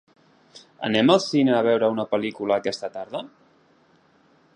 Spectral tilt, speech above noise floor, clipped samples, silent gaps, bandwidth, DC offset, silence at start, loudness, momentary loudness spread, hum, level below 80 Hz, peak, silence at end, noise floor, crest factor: -5.5 dB/octave; 38 dB; under 0.1%; none; 10 kHz; under 0.1%; 0.55 s; -22 LUFS; 14 LU; none; -68 dBFS; -2 dBFS; 1.3 s; -59 dBFS; 22 dB